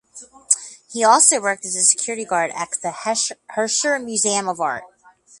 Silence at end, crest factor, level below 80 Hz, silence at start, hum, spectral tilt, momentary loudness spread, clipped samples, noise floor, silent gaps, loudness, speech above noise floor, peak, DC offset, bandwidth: 0.55 s; 20 dB; -70 dBFS; 0.15 s; none; -0.5 dB/octave; 12 LU; under 0.1%; -52 dBFS; none; -18 LUFS; 32 dB; 0 dBFS; under 0.1%; 11.5 kHz